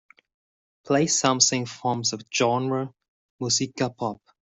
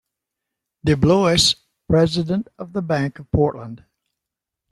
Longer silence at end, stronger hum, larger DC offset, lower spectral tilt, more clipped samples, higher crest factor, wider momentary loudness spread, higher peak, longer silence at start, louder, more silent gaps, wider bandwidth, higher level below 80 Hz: second, 0.4 s vs 0.95 s; neither; neither; second, -3 dB/octave vs -5 dB/octave; neither; first, 24 dB vs 18 dB; about the same, 12 LU vs 13 LU; about the same, -2 dBFS vs -2 dBFS; about the same, 0.85 s vs 0.85 s; second, -24 LUFS vs -19 LUFS; first, 3.08-3.39 s vs none; second, 8.2 kHz vs 12.5 kHz; second, -66 dBFS vs -42 dBFS